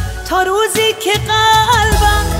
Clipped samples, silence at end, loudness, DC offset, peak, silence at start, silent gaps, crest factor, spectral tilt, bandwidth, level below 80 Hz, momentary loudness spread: under 0.1%; 0 s; -12 LUFS; under 0.1%; 0 dBFS; 0 s; none; 12 dB; -3 dB/octave; 16.5 kHz; -22 dBFS; 6 LU